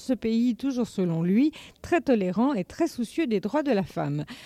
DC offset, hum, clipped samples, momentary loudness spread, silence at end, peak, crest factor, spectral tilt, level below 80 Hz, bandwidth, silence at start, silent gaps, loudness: under 0.1%; none; under 0.1%; 6 LU; 0 s; -10 dBFS; 14 dB; -7 dB/octave; -58 dBFS; 14.5 kHz; 0 s; none; -26 LUFS